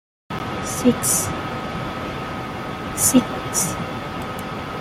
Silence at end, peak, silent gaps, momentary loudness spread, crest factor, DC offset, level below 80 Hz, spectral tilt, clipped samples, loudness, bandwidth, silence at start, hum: 0 s; -4 dBFS; none; 12 LU; 20 dB; under 0.1%; -44 dBFS; -3.5 dB/octave; under 0.1%; -22 LUFS; 16 kHz; 0.3 s; none